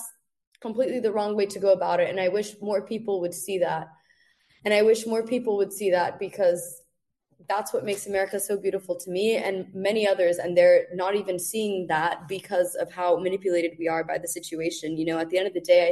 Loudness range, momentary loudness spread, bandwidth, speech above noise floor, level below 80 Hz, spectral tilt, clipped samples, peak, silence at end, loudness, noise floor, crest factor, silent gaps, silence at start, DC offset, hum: 4 LU; 9 LU; 12.5 kHz; 48 dB; -70 dBFS; -4 dB/octave; under 0.1%; -8 dBFS; 0 s; -25 LUFS; -73 dBFS; 18 dB; 0.47-0.52 s; 0 s; under 0.1%; none